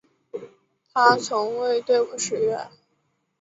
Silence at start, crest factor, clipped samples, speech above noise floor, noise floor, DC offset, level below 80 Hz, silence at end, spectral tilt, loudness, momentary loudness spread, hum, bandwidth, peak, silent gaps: 0.35 s; 22 dB; under 0.1%; 50 dB; -71 dBFS; under 0.1%; -72 dBFS; 0.75 s; -2.5 dB/octave; -22 LUFS; 20 LU; none; 8 kHz; -2 dBFS; none